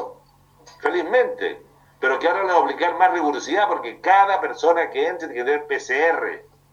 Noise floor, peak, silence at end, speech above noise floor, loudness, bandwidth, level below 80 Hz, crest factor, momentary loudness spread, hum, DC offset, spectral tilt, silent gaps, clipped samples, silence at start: -54 dBFS; -2 dBFS; 0.3 s; 34 dB; -20 LUFS; 8.2 kHz; -66 dBFS; 18 dB; 10 LU; none; under 0.1%; -3 dB/octave; none; under 0.1%; 0 s